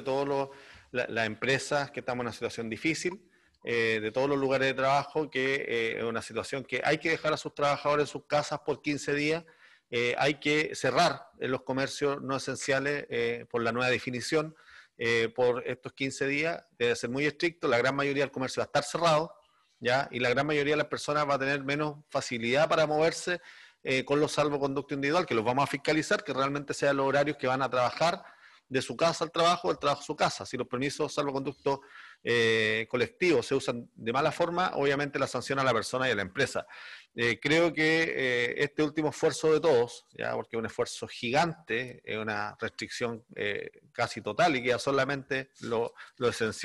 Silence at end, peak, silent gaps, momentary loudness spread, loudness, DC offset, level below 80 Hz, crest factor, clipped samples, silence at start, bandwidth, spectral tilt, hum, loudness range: 0 s; -12 dBFS; none; 9 LU; -29 LUFS; under 0.1%; -66 dBFS; 18 dB; under 0.1%; 0 s; 12.5 kHz; -4.5 dB/octave; none; 3 LU